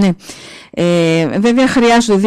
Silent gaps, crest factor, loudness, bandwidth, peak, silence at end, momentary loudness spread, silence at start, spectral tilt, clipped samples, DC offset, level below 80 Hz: none; 8 dB; -12 LUFS; 13.5 kHz; -4 dBFS; 0 s; 17 LU; 0 s; -5.5 dB/octave; under 0.1%; under 0.1%; -44 dBFS